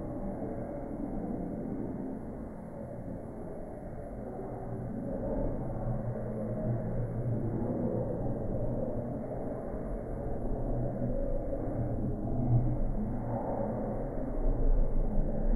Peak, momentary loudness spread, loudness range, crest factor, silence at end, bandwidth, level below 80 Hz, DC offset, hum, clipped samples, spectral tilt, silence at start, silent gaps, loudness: -16 dBFS; 9 LU; 6 LU; 16 dB; 0 s; 2.3 kHz; -36 dBFS; under 0.1%; none; under 0.1%; -12 dB/octave; 0 s; none; -36 LUFS